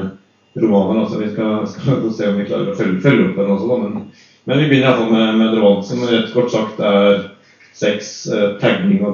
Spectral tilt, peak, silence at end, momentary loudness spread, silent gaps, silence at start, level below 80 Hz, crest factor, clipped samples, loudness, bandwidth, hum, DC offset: -6.5 dB/octave; 0 dBFS; 0 s; 8 LU; none; 0 s; -62 dBFS; 16 dB; under 0.1%; -16 LUFS; 7.2 kHz; none; under 0.1%